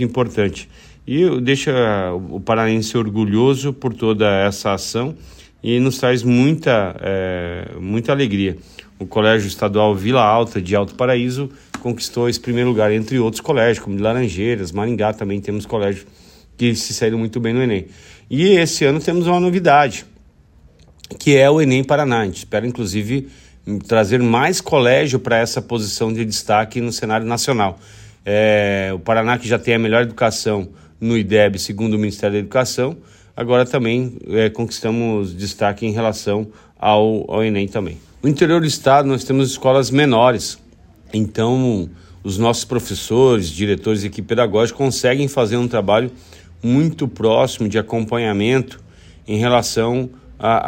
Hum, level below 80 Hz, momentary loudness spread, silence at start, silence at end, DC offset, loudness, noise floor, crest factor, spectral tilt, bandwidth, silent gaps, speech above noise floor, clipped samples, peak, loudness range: none; -46 dBFS; 10 LU; 0 s; 0 s; under 0.1%; -17 LUFS; -49 dBFS; 16 dB; -5.5 dB/octave; 16.5 kHz; none; 32 dB; under 0.1%; 0 dBFS; 3 LU